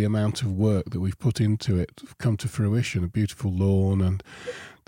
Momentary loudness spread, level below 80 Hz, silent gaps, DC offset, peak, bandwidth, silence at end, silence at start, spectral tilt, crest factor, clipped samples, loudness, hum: 9 LU; -48 dBFS; none; under 0.1%; -10 dBFS; 15.5 kHz; 0.15 s; 0 s; -7 dB/octave; 14 dB; under 0.1%; -25 LUFS; none